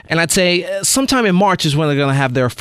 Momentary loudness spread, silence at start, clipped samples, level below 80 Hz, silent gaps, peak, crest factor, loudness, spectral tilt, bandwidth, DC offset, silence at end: 3 LU; 0.1 s; under 0.1%; -44 dBFS; none; -2 dBFS; 14 dB; -14 LUFS; -4 dB/octave; 16 kHz; under 0.1%; 0.05 s